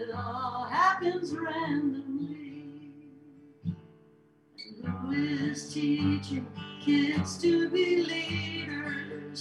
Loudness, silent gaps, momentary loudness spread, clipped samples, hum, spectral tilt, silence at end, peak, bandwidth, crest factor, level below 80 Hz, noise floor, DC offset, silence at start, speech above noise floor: -30 LUFS; none; 16 LU; under 0.1%; none; -5.5 dB/octave; 0 s; -12 dBFS; 11.5 kHz; 18 dB; -66 dBFS; -61 dBFS; under 0.1%; 0 s; 31 dB